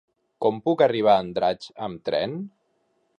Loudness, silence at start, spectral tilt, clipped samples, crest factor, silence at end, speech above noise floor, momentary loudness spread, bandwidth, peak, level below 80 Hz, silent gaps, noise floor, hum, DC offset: -23 LUFS; 0.4 s; -7 dB/octave; under 0.1%; 18 dB; 0.7 s; 47 dB; 14 LU; 9.8 kHz; -6 dBFS; -62 dBFS; none; -70 dBFS; none; under 0.1%